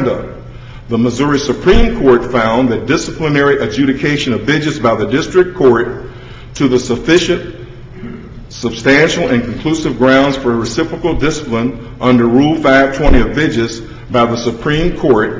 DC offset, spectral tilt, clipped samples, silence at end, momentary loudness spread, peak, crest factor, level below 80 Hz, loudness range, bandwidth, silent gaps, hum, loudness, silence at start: under 0.1%; -5.5 dB/octave; under 0.1%; 0 s; 19 LU; 0 dBFS; 12 dB; -26 dBFS; 2 LU; 7.8 kHz; none; none; -13 LUFS; 0 s